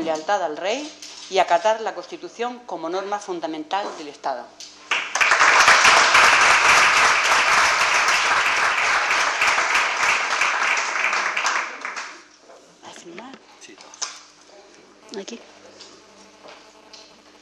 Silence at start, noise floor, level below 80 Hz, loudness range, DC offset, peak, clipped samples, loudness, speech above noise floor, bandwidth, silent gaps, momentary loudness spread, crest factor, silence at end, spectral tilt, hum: 0 s; -48 dBFS; -58 dBFS; 23 LU; under 0.1%; -6 dBFS; under 0.1%; -17 LUFS; 23 dB; 14.5 kHz; none; 22 LU; 16 dB; 0.4 s; 0 dB/octave; none